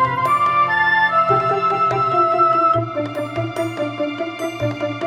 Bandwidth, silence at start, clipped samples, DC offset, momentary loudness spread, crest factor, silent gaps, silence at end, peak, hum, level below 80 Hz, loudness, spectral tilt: 17 kHz; 0 s; under 0.1%; under 0.1%; 10 LU; 14 dB; none; 0 s; -4 dBFS; none; -56 dBFS; -17 LUFS; -6 dB/octave